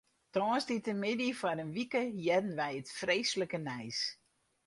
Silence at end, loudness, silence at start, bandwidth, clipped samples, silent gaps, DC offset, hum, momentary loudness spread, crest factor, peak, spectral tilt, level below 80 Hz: 0.55 s; -35 LUFS; 0.35 s; 11.5 kHz; under 0.1%; none; under 0.1%; none; 6 LU; 18 dB; -18 dBFS; -4 dB/octave; -76 dBFS